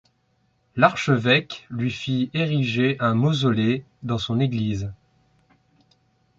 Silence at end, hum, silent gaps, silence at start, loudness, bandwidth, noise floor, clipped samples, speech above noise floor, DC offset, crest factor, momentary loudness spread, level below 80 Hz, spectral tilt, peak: 1.45 s; none; none; 0.75 s; -22 LUFS; 7.8 kHz; -67 dBFS; under 0.1%; 45 dB; under 0.1%; 22 dB; 10 LU; -54 dBFS; -6.5 dB/octave; -2 dBFS